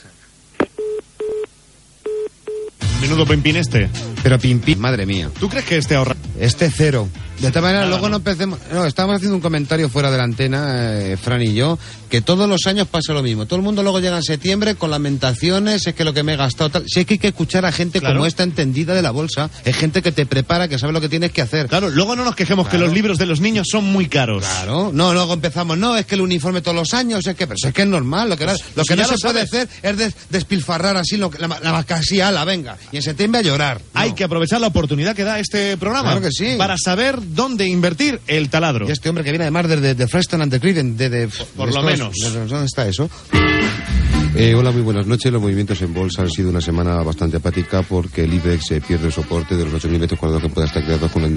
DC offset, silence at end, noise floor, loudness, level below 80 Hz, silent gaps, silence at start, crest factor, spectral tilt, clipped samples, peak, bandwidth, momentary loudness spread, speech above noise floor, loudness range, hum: under 0.1%; 0 s; -48 dBFS; -17 LUFS; -34 dBFS; none; 0.6 s; 16 dB; -5 dB/octave; under 0.1%; 0 dBFS; 11.5 kHz; 6 LU; 31 dB; 2 LU; none